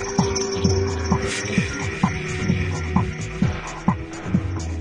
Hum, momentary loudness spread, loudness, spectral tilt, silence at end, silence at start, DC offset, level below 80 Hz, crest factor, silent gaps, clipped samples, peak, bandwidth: none; 4 LU; -23 LUFS; -5.5 dB/octave; 0 s; 0 s; under 0.1%; -38 dBFS; 20 dB; none; under 0.1%; -4 dBFS; 11 kHz